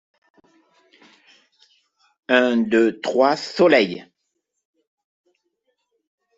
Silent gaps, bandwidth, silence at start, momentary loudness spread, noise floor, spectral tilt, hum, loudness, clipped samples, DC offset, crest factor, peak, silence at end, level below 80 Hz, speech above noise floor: none; 7.8 kHz; 2.3 s; 9 LU; -76 dBFS; -5 dB/octave; none; -18 LUFS; under 0.1%; under 0.1%; 20 dB; -2 dBFS; 2.35 s; -68 dBFS; 59 dB